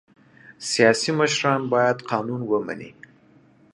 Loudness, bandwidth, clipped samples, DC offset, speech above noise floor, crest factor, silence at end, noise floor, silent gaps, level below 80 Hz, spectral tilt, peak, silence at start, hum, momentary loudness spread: -21 LUFS; 11.5 kHz; under 0.1%; under 0.1%; 33 dB; 20 dB; 0.85 s; -55 dBFS; none; -68 dBFS; -4 dB/octave; -2 dBFS; 0.5 s; none; 15 LU